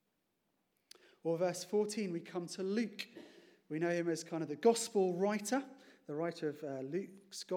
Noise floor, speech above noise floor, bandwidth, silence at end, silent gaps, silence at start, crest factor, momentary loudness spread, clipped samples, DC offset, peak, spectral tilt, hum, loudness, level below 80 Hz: -82 dBFS; 46 dB; 17.5 kHz; 0 s; none; 1.25 s; 20 dB; 14 LU; under 0.1%; under 0.1%; -18 dBFS; -5 dB/octave; none; -37 LUFS; under -90 dBFS